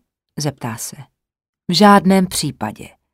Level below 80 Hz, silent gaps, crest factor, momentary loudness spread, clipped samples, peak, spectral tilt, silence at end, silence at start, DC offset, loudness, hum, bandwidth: -50 dBFS; 1.49-1.53 s; 18 dB; 19 LU; under 0.1%; 0 dBFS; -5 dB/octave; 0.25 s; 0.35 s; under 0.1%; -15 LUFS; none; 16 kHz